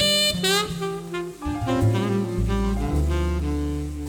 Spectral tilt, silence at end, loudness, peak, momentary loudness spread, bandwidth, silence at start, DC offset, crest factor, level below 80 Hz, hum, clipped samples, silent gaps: -4.5 dB/octave; 0 s; -24 LUFS; -10 dBFS; 11 LU; over 20 kHz; 0 s; under 0.1%; 14 dB; -30 dBFS; none; under 0.1%; none